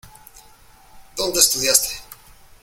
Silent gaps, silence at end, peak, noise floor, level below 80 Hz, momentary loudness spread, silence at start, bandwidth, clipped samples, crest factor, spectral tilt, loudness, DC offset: none; 0.5 s; 0 dBFS; -49 dBFS; -48 dBFS; 19 LU; 0.05 s; 17 kHz; under 0.1%; 24 dB; 0 dB/octave; -16 LUFS; under 0.1%